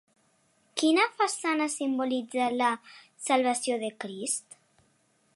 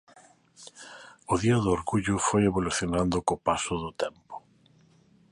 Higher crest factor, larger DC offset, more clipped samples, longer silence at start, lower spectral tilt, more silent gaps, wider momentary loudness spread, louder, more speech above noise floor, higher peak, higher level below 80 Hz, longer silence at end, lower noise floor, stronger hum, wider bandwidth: about the same, 22 dB vs 20 dB; neither; neither; first, 0.75 s vs 0.6 s; second, -2 dB/octave vs -5 dB/octave; neither; second, 11 LU vs 22 LU; about the same, -28 LUFS vs -27 LUFS; first, 41 dB vs 34 dB; about the same, -8 dBFS vs -8 dBFS; second, -84 dBFS vs -48 dBFS; about the same, 0.95 s vs 0.9 s; first, -69 dBFS vs -61 dBFS; neither; about the same, 11.5 kHz vs 11.5 kHz